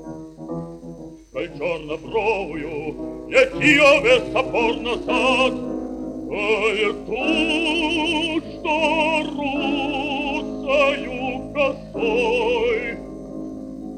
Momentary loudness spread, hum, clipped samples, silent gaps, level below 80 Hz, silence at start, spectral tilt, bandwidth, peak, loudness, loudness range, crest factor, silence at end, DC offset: 16 LU; none; under 0.1%; none; -44 dBFS; 0 s; -4.5 dB/octave; 11 kHz; 0 dBFS; -20 LUFS; 5 LU; 20 dB; 0 s; under 0.1%